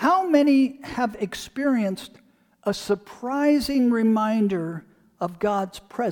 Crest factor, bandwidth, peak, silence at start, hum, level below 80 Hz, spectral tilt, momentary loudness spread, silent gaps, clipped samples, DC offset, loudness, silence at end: 18 dB; 19 kHz; -6 dBFS; 0 s; none; -56 dBFS; -6 dB/octave; 13 LU; none; under 0.1%; under 0.1%; -23 LUFS; 0 s